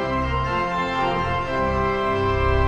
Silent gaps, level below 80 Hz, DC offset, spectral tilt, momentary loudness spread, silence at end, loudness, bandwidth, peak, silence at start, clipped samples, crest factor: none; -30 dBFS; under 0.1%; -7 dB/octave; 2 LU; 0 s; -22 LUFS; 8.8 kHz; -8 dBFS; 0 s; under 0.1%; 14 dB